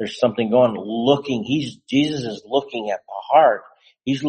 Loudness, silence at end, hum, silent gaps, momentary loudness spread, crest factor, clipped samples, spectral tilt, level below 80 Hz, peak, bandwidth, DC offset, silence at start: -20 LUFS; 0 s; none; none; 12 LU; 18 dB; under 0.1%; -6 dB/octave; -62 dBFS; -2 dBFS; 8.8 kHz; under 0.1%; 0 s